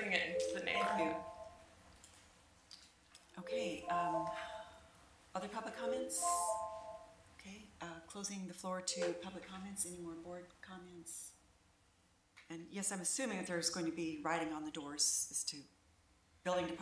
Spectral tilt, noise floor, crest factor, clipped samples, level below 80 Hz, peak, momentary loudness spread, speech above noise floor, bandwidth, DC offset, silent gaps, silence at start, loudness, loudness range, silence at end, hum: -2.5 dB/octave; -73 dBFS; 24 dB; under 0.1%; -72 dBFS; -18 dBFS; 21 LU; 31 dB; 11 kHz; under 0.1%; none; 0 s; -40 LUFS; 7 LU; 0 s; none